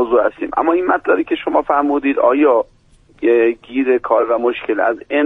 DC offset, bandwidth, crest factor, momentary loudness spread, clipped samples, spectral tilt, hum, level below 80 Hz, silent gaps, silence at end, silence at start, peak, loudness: under 0.1%; 3.9 kHz; 14 dB; 5 LU; under 0.1%; -6.5 dB/octave; none; -50 dBFS; none; 0 s; 0 s; -2 dBFS; -16 LUFS